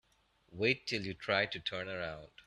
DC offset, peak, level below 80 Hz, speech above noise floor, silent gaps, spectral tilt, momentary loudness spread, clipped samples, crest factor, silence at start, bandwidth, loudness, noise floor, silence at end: under 0.1%; -16 dBFS; -68 dBFS; 35 dB; none; -4.5 dB/octave; 9 LU; under 0.1%; 22 dB; 0.5 s; 12 kHz; -35 LUFS; -72 dBFS; 0.2 s